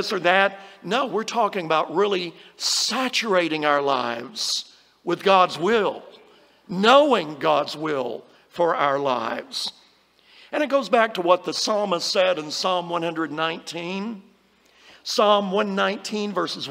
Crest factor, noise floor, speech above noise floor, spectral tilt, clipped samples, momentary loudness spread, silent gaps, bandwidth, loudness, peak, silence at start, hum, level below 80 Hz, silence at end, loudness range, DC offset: 20 dB; -58 dBFS; 36 dB; -3 dB/octave; under 0.1%; 12 LU; none; 16 kHz; -22 LUFS; -2 dBFS; 0 s; none; -74 dBFS; 0 s; 4 LU; under 0.1%